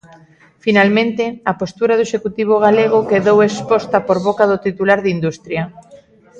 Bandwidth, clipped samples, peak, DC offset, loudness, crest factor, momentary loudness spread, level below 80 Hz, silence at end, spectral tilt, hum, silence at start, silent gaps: 8.2 kHz; under 0.1%; 0 dBFS; under 0.1%; -15 LUFS; 14 dB; 9 LU; -54 dBFS; 0 s; -6 dB/octave; none; 0.65 s; none